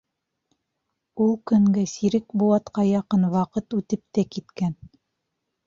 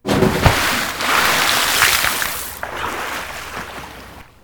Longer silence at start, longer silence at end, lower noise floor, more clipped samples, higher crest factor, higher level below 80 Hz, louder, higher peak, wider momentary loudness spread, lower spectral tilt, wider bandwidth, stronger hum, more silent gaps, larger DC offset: first, 1.15 s vs 0.05 s; first, 0.95 s vs 0.2 s; first, -79 dBFS vs -38 dBFS; neither; about the same, 16 dB vs 18 dB; second, -60 dBFS vs -34 dBFS; second, -23 LUFS vs -16 LUFS; second, -8 dBFS vs 0 dBFS; second, 9 LU vs 16 LU; first, -7.5 dB/octave vs -2.5 dB/octave; second, 7.4 kHz vs over 20 kHz; neither; neither; neither